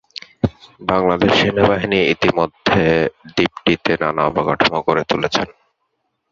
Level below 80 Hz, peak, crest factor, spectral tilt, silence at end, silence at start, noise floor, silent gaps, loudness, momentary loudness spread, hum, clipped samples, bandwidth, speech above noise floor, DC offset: -42 dBFS; 0 dBFS; 18 dB; -5.5 dB/octave; 0.8 s; 0.45 s; -71 dBFS; none; -17 LUFS; 9 LU; none; under 0.1%; 7.6 kHz; 54 dB; under 0.1%